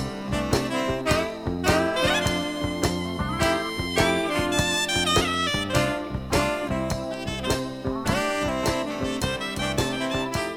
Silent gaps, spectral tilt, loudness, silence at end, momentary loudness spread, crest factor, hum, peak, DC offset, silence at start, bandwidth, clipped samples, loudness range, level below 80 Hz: none; -4 dB/octave; -25 LUFS; 0 s; 6 LU; 18 dB; none; -6 dBFS; under 0.1%; 0 s; 17.5 kHz; under 0.1%; 3 LU; -40 dBFS